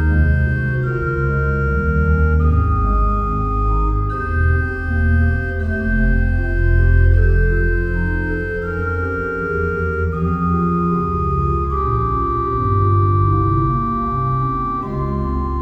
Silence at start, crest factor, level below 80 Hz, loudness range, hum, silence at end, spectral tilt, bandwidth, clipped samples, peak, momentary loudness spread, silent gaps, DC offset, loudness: 0 s; 12 dB; -20 dBFS; 2 LU; none; 0 s; -10.5 dB/octave; 4.9 kHz; under 0.1%; -4 dBFS; 6 LU; none; 0.2%; -18 LUFS